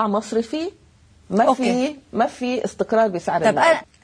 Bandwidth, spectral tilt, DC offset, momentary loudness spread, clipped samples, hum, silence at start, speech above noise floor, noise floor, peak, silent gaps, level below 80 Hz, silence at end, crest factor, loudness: 10.5 kHz; -5 dB/octave; under 0.1%; 8 LU; under 0.1%; none; 0 s; 28 dB; -47 dBFS; -4 dBFS; none; -58 dBFS; 0.2 s; 18 dB; -20 LUFS